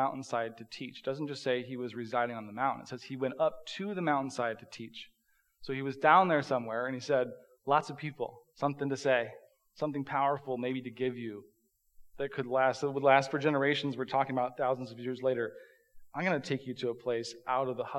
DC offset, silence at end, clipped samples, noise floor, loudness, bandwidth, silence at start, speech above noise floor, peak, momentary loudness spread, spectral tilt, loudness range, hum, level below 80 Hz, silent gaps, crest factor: under 0.1%; 0 s; under 0.1%; -71 dBFS; -32 LUFS; 12.5 kHz; 0 s; 39 dB; -10 dBFS; 13 LU; -5.5 dB/octave; 5 LU; none; -74 dBFS; none; 24 dB